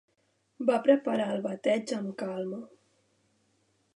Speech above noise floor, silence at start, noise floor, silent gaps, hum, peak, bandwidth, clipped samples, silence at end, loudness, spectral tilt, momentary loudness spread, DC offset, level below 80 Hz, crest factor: 45 dB; 0.6 s; -73 dBFS; none; none; -10 dBFS; 11 kHz; under 0.1%; 1.3 s; -29 LUFS; -6 dB/octave; 11 LU; under 0.1%; -84 dBFS; 22 dB